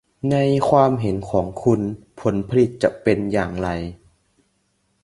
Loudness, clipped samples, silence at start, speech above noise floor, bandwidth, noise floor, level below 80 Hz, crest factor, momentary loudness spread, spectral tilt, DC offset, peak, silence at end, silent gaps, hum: -20 LUFS; under 0.1%; 0.25 s; 48 dB; 11.5 kHz; -67 dBFS; -44 dBFS; 20 dB; 9 LU; -8 dB/octave; under 0.1%; -2 dBFS; 1.1 s; none; none